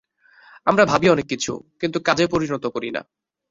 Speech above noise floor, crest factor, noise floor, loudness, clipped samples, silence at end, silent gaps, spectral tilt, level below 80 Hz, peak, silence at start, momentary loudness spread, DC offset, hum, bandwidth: 32 dB; 20 dB; -52 dBFS; -20 LUFS; under 0.1%; 0.5 s; none; -4.5 dB/octave; -54 dBFS; -2 dBFS; 0.65 s; 12 LU; under 0.1%; none; 7.8 kHz